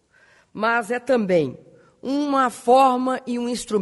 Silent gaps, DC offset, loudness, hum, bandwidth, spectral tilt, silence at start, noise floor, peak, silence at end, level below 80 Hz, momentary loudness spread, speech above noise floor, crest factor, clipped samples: none; under 0.1%; -21 LUFS; none; 11.5 kHz; -5 dB/octave; 0.55 s; -56 dBFS; -4 dBFS; 0 s; -62 dBFS; 11 LU; 36 dB; 16 dB; under 0.1%